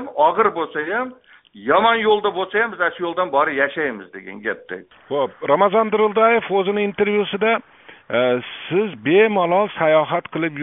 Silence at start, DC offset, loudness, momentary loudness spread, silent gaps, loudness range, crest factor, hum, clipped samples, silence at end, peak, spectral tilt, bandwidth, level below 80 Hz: 0 s; under 0.1%; -19 LUFS; 11 LU; none; 2 LU; 18 dB; none; under 0.1%; 0 s; -2 dBFS; -3 dB/octave; 4 kHz; -64 dBFS